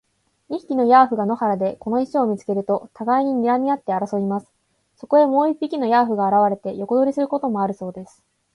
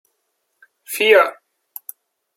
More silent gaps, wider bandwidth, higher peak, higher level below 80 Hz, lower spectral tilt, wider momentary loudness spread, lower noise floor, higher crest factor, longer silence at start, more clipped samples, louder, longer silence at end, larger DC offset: neither; second, 11 kHz vs 16.5 kHz; about the same, -2 dBFS vs -2 dBFS; first, -66 dBFS vs -76 dBFS; first, -8 dB/octave vs -1 dB/octave; second, 10 LU vs 24 LU; second, -62 dBFS vs -72 dBFS; about the same, 18 dB vs 20 dB; second, 0.5 s vs 0.9 s; neither; second, -20 LUFS vs -15 LUFS; second, 0.5 s vs 1.05 s; neither